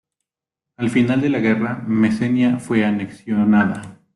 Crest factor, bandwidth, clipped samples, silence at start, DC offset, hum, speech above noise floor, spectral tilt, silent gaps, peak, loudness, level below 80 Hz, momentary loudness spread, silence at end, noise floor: 14 dB; 11.5 kHz; under 0.1%; 0.8 s; under 0.1%; none; 68 dB; -7.5 dB/octave; none; -4 dBFS; -18 LUFS; -56 dBFS; 7 LU; 0.2 s; -86 dBFS